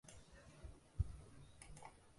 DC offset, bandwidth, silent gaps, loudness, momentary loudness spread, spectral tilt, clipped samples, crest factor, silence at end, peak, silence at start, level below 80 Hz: under 0.1%; 11.5 kHz; none; -53 LUFS; 16 LU; -5.5 dB/octave; under 0.1%; 24 dB; 0 s; -26 dBFS; 0.05 s; -54 dBFS